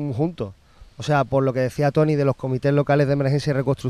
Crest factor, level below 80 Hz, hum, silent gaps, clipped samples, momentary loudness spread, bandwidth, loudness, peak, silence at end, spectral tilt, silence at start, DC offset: 14 dB; -50 dBFS; none; none; under 0.1%; 7 LU; 11 kHz; -21 LUFS; -6 dBFS; 0 s; -8 dB/octave; 0 s; under 0.1%